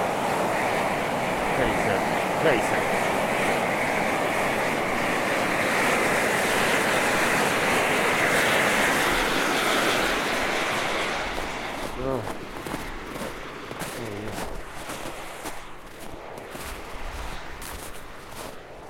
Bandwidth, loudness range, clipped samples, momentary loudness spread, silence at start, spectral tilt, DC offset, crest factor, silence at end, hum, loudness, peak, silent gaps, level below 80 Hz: 16.5 kHz; 15 LU; under 0.1%; 16 LU; 0 s; -3 dB/octave; under 0.1%; 16 dB; 0 s; none; -24 LUFS; -8 dBFS; none; -44 dBFS